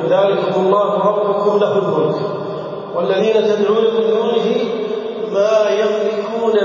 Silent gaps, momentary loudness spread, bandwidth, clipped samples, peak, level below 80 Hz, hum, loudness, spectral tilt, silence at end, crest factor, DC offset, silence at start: none; 8 LU; 7.2 kHz; under 0.1%; -2 dBFS; -68 dBFS; none; -16 LUFS; -6 dB/octave; 0 s; 14 dB; under 0.1%; 0 s